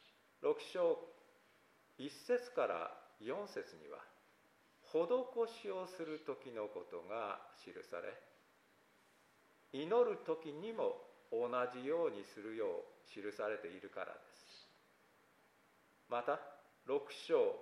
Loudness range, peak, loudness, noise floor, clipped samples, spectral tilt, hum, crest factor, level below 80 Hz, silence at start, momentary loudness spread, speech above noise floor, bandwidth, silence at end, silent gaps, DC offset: 8 LU; -22 dBFS; -42 LUFS; -72 dBFS; under 0.1%; -5 dB/octave; none; 20 dB; under -90 dBFS; 0.4 s; 17 LU; 31 dB; 13.5 kHz; 0 s; none; under 0.1%